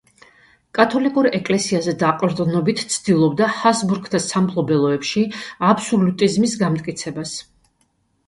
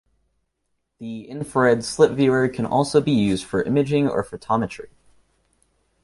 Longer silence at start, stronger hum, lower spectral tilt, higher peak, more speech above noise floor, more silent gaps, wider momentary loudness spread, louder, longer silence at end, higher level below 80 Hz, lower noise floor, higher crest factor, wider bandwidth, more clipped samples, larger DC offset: second, 0.75 s vs 1 s; neither; about the same, -5 dB/octave vs -6 dB/octave; about the same, 0 dBFS vs -2 dBFS; second, 46 dB vs 54 dB; neither; second, 8 LU vs 15 LU; about the same, -19 LUFS vs -20 LUFS; second, 0.85 s vs 1.2 s; second, -58 dBFS vs -52 dBFS; second, -65 dBFS vs -74 dBFS; about the same, 18 dB vs 20 dB; about the same, 11.5 kHz vs 11.5 kHz; neither; neither